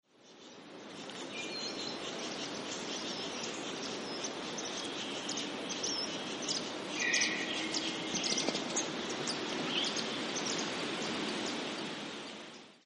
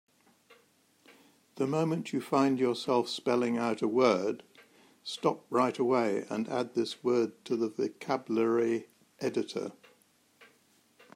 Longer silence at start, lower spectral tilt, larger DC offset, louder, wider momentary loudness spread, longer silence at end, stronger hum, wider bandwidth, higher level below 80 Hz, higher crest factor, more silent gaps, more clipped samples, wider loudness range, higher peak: second, 0.2 s vs 1.55 s; second, -1.5 dB/octave vs -5.5 dB/octave; neither; second, -36 LUFS vs -31 LUFS; about the same, 11 LU vs 9 LU; second, 0.05 s vs 0.7 s; neither; second, 11.5 kHz vs 15.5 kHz; first, -76 dBFS vs -82 dBFS; about the same, 22 dB vs 20 dB; neither; neither; about the same, 5 LU vs 4 LU; second, -16 dBFS vs -12 dBFS